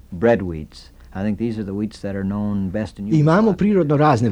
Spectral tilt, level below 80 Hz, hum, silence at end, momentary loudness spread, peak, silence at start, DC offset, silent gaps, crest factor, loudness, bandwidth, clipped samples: -8.5 dB/octave; -44 dBFS; none; 0 s; 12 LU; -4 dBFS; 0.1 s; under 0.1%; none; 16 dB; -20 LUFS; 10 kHz; under 0.1%